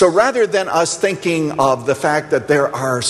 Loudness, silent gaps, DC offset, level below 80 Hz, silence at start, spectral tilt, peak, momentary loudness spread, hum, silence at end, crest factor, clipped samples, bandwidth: -16 LUFS; none; under 0.1%; -54 dBFS; 0 s; -4 dB/octave; -2 dBFS; 4 LU; none; 0 s; 14 dB; under 0.1%; 13 kHz